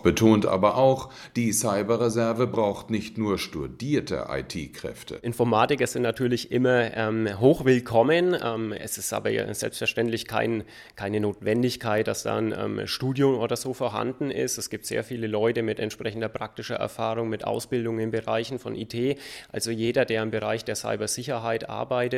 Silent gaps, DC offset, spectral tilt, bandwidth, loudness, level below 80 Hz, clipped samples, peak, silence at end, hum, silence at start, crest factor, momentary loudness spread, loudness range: none; under 0.1%; -5 dB/octave; 16 kHz; -26 LUFS; -56 dBFS; under 0.1%; -4 dBFS; 0 s; none; 0 s; 20 dB; 11 LU; 5 LU